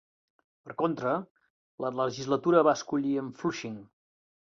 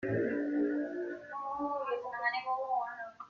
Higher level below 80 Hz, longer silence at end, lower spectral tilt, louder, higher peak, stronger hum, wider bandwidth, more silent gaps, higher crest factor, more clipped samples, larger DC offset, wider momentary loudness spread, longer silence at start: about the same, -72 dBFS vs -74 dBFS; first, 0.6 s vs 0 s; second, -6 dB/octave vs -8 dB/octave; first, -29 LUFS vs -35 LUFS; first, -8 dBFS vs -20 dBFS; neither; first, 7.6 kHz vs 6.6 kHz; first, 1.31-1.35 s, 1.50-1.78 s vs none; first, 22 dB vs 16 dB; neither; neither; first, 15 LU vs 8 LU; first, 0.65 s vs 0 s